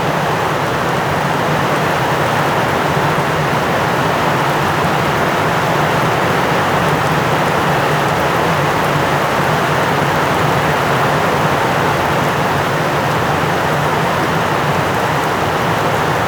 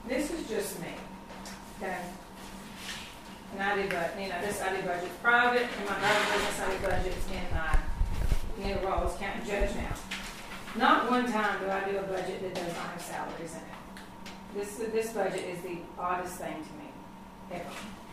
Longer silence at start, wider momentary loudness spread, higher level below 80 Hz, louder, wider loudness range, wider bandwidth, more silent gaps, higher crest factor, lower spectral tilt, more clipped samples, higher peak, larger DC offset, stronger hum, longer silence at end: about the same, 0 s vs 0 s; second, 1 LU vs 18 LU; about the same, -40 dBFS vs -40 dBFS; first, -14 LUFS vs -32 LUFS; second, 1 LU vs 8 LU; first, over 20 kHz vs 15.5 kHz; neither; second, 12 dB vs 22 dB; about the same, -5 dB/octave vs -4 dB/octave; neither; first, -2 dBFS vs -10 dBFS; neither; neither; about the same, 0 s vs 0 s